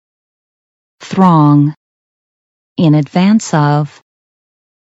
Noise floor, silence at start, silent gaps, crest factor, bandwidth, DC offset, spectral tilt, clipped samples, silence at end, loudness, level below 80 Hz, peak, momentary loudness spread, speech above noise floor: under -90 dBFS; 1 s; 1.77-2.76 s; 14 dB; 8 kHz; under 0.1%; -7 dB/octave; under 0.1%; 1.05 s; -11 LUFS; -60 dBFS; 0 dBFS; 11 LU; over 81 dB